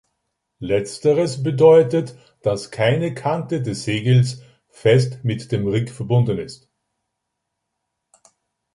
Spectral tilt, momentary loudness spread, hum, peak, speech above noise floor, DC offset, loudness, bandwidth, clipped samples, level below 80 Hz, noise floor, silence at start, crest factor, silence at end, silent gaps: -7 dB/octave; 11 LU; none; -2 dBFS; 60 dB; under 0.1%; -19 LUFS; 11.5 kHz; under 0.1%; -54 dBFS; -78 dBFS; 0.6 s; 18 dB; 2.2 s; none